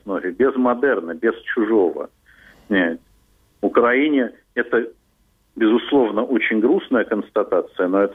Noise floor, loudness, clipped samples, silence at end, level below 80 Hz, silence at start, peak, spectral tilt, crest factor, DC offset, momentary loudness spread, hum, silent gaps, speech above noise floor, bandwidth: -61 dBFS; -19 LUFS; under 0.1%; 0 s; -60 dBFS; 0.05 s; -2 dBFS; -7.5 dB/octave; 18 dB; under 0.1%; 8 LU; none; none; 42 dB; 3.9 kHz